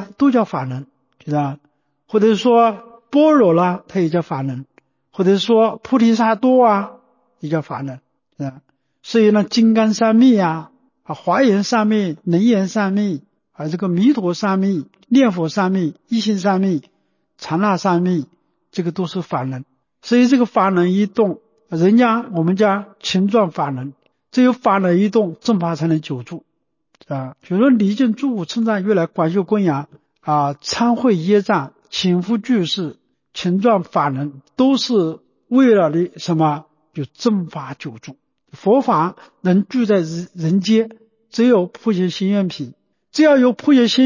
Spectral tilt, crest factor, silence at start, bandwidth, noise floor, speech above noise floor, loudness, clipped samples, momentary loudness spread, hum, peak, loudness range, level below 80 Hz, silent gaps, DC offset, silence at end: -6.5 dB/octave; 14 dB; 0 s; 7.4 kHz; -64 dBFS; 48 dB; -17 LUFS; under 0.1%; 15 LU; none; -4 dBFS; 3 LU; -64 dBFS; none; under 0.1%; 0 s